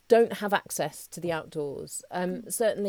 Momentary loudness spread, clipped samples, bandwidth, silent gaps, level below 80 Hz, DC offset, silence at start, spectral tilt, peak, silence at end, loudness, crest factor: 12 LU; under 0.1%; 19.5 kHz; none; -66 dBFS; under 0.1%; 0.1 s; -4 dB/octave; -8 dBFS; 0 s; -29 LUFS; 20 dB